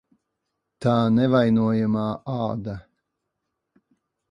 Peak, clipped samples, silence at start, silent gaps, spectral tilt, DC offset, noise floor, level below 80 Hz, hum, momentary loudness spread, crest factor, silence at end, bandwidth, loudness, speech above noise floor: -6 dBFS; under 0.1%; 0.8 s; none; -9 dB/octave; under 0.1%; -80 dBFS; -56 dBFS; none; 12 LU; 18 dB; 1.5 s; 7.2 kHz; -22 LUFS; 59 dB